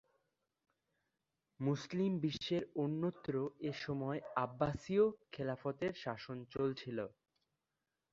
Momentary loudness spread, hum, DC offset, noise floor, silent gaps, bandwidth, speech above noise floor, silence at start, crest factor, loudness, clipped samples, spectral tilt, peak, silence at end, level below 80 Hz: 9 LU; none; under 0.1%; -90 dBFS; none; 7.6 kHz; 51 dB; 1.6 s; 20 dB; -39 LUFS; under 0.1%; -6 dB/octave; -20 dBFS; 1.05 s; -70 dBFS